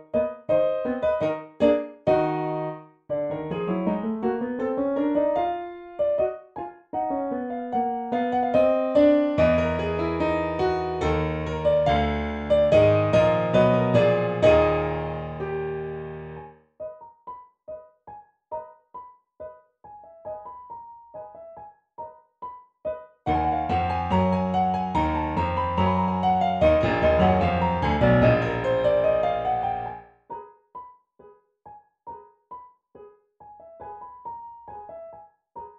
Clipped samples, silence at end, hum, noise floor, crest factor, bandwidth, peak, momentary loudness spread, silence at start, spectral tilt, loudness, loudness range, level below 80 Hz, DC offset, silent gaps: under 0.1%; 0.05 s; none; -54 dBFS; 18 dB; 7.8 kHz; -6 dBFS; 23 LU; 0 s; -8 dB/octave; -23 LUFS; 21 LU; -42 dBFS; under 0.1%; none